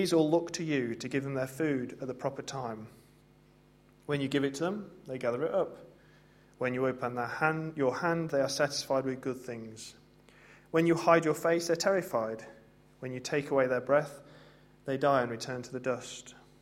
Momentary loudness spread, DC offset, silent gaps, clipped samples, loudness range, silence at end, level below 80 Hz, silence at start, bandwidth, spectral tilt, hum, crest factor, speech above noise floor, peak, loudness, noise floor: 16 LU; under 0.1%; none; under 0.1%; 6 LU; 0.25 s; -70 dBFS; 0 s; 16 kHz; -5 dB/octave; none; 24 dB; 30 dB; -8 dBFS; -31 LUFS; -61 dBFS